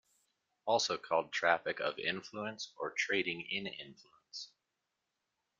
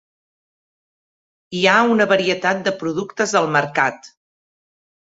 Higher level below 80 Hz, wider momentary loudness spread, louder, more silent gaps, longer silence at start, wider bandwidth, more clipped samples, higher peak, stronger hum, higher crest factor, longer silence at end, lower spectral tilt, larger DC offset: second, -82 dBFS vs -64 dBFS; first, 15 LU vs 8 LU; second, -35 LUFS vs -17 LUFS; neither; second, 0.65 s vs 1.5 s; first, 9.2 kHz vs 8 kHz; neither; second, -14 dBFS vs -2 dBFS; neither; first, 26 dB vs 20 dB; first, 1.15 s vs 1 s; second, -2.5 dB/octave vs -4 dB/octave; neither